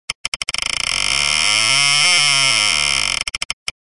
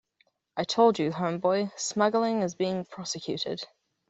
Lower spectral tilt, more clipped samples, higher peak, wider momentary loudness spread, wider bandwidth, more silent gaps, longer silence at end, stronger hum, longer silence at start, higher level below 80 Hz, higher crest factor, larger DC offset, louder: second, 1 dB/octave vs -4.5 dB/octave; neither; first, -2 dBFS vs -10 dBFS; about the same, 11 LU vs 11 LU; first, 11.5 kHz vs 8.2 kHz; first, 0.15-0.32 s, 3.45-3.66 s vs none; second, 0.1 s vs 0.45 s; neither; second, 0.1 s vs 0.55 s; first, -44 dBFS vs -70 dBFS; about the same, 16 dB vs 18 dB; first, 0.6% vs under 0.1%; first, -14 LUFS vs -28 LUFS